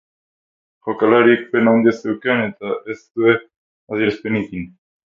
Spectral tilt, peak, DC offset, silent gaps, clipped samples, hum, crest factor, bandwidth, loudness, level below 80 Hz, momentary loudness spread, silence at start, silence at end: -7.5 dB/octave; 0 dBFS; under 0.1%; 3.56-3.87 s; under 0.1%; none; 18 dB; 7.2 kHz; -17 LUFS; -56 dBFS; 15 LU; 0.85 s; 0.4 s